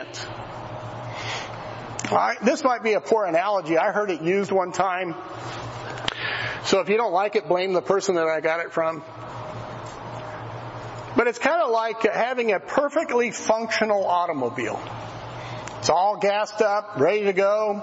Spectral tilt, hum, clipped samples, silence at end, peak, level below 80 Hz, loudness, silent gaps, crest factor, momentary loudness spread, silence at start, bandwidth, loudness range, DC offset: -4.5 dB/octave; none; under 0.1%; 0 s; -6 dBFS; -58 dBFS; -23 LUFS; none; 18 dB; 14 LU; 0 s; 8 kHz; 4 LU; under 0.1%